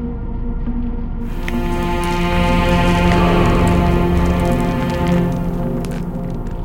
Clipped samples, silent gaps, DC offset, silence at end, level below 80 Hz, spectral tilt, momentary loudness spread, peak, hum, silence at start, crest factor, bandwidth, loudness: under 0.1%; none; under 0.1%; 0 s; -22 dBFS; -7 dB/octave; 11 LU; -2 dBFS; none; 0 s; 14 dB; 16.5 kHz; -18 LUFS